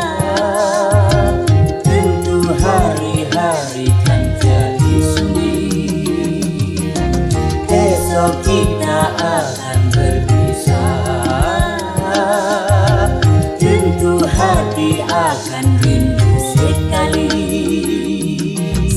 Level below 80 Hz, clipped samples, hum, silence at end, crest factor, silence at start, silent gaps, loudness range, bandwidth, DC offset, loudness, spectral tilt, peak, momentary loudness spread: -24 dBFS; under 0.1%; none; 0 s; 12 dB; 0 s; none; 2 LU; 14 kHz; under 0.1%; -14 LUFS; -6 dB/octave; 0 dBFS; 5 LU